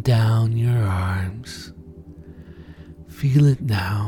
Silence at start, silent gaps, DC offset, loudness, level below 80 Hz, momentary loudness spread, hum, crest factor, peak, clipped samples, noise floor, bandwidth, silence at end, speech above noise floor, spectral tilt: 0 s; none; under 0.1%; -20 LUFS; -44 dBFS; 25 LU; none; 16 dB; -6 dBFS; under 0.1%; -41 dBFS; 16.5 kHz; 0 s; 22 dB; -7.5 dB/octave